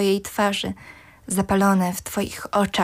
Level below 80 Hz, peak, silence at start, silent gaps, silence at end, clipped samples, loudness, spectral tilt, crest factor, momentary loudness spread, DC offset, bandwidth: -48 dBFS; -10 dBFS; 0 s; none; 0 s; under 0.1%; -22 LUFS; -4.5 dB/octave; 14 dB; 11 LU; under 0.1%; 16 kHz